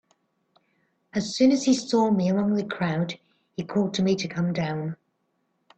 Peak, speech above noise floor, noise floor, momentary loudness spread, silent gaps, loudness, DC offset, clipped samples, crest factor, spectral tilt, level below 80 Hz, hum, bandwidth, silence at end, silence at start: -8 dBFS; 50 dB; -73 dBFS; 14 LU; none; -25 LUFS; under 0.1%; under 0.1%; 18 dB; -6 dB/octave; -64 dBFS; none; 8.6 kHz; 0.85 s; 1.15 s